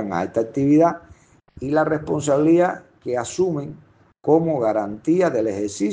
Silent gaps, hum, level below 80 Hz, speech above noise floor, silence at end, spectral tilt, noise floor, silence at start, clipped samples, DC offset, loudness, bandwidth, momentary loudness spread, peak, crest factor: none; none; -56 dBFS; 31 dB; 0 s; -6.5 dB/octave; -51 dBFS; 0 s; under 0.1%; under 0.1%; -20 LUFS; 9.6 kHz; 13 LU; -4 dBFS; 16 dB